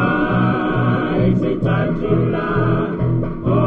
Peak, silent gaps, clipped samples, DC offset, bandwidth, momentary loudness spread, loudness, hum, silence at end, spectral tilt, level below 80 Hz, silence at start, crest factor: -4 dBFS; none; under 0.1%; under 0.1%; 4.6 kHz; 3 LU; -18 LUFS; none; 0 s; -10 dB/octave; -34 dBFS; 0 s; 14 dB